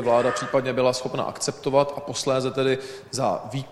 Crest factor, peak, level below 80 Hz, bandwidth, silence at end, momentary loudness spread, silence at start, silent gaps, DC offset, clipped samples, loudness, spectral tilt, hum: 18 dB; -6 dBFS; -60 dBFS; 13.5 kHz; 0 s; 7 LU; 0 s; none; under 0.1%; under 0.1%; -24 LUFS; -4.5 dB/octave; none